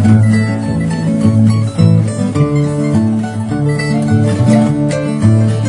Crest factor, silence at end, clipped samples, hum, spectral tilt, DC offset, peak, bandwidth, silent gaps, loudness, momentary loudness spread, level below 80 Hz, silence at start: 12 dB; 0 s; 0.2%; none; -8 dB/octave; under 0.1%; 0 dBFS; 10.5 kHz; none; -12 LUFS; 5 LU; -42 dBFS; 0 s